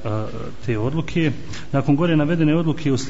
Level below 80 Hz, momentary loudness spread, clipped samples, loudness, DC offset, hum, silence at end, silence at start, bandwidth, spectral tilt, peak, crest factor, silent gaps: -44 dBFS; 11 LU; under 0.1%; -21 LUFS; 4%; none; 0 s; 0 s; 8 kHz; -7 dB/octave; -6 dBFS; 12 dB; none